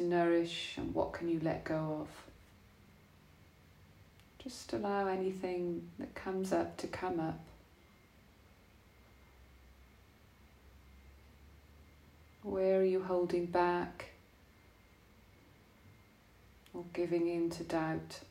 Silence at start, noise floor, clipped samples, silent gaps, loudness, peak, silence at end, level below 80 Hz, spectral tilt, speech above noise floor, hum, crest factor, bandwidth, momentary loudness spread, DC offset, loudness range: 0 s; -63 dBFS; under 0.1%; none; -36 LUFS; -20 dBFS; 0 s; -64 dBFS; -6 dB/octave; 28 dB; none; 20 dB; 15.5 kHz; 17 LU; under 0.1%; 10 LU